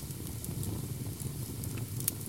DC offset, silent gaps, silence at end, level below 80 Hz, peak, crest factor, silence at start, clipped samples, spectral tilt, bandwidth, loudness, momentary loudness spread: 0.1%; none; 0 s; -50 dBFS; -8 dBFS; 30 dB; 0 s; under 0.1%; -4.5 dB/octave; 17 kHz; -38 LUFS; 5 LU